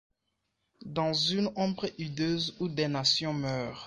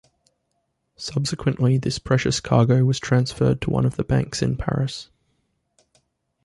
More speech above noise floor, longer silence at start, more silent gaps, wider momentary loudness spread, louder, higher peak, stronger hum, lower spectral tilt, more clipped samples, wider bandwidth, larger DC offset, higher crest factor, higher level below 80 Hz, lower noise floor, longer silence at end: about the same, 50 dB vs 53 dB; second, 0.8 s vs 1 s; neither; about the same, 9 LU vs 8 LU; second, -30 LUFS vs -22 LUFS; second, -12 dBFS vs -4 dBFS; neither; second, -4.5 dB/octave vs -6 dB/octave; neither; about the same, 11.5 kHz vs 11.5 kHz; neither; about the same, 20 dB vs 18 dB; second, -64 dBFS vs -44 dBFS; first, -81 dBFS vs -73 dBFS; second, 0 s vs 1.4 s